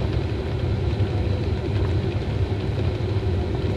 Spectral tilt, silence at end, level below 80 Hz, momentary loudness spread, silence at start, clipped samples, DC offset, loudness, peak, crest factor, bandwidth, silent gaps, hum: -8.5 dB/octave; 0 s; -32 dBFS; 2 LU; 0 s; under 0.1%; under 0.1%; -25 LUFS; -12 dBFS; 12 dB; 7.8 kHz; none; none